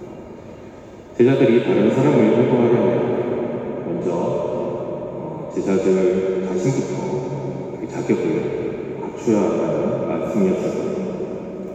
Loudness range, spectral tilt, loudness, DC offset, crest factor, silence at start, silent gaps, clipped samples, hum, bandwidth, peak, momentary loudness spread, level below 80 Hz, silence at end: 5 LU; -7.5 dB/octave; -20 LUFS; under 0.1%; 16 dB; 0 s; none; under 0.1%; none; 8.2 kHz; -4 dBFS; 13 LU; -54 dBFS; 0 s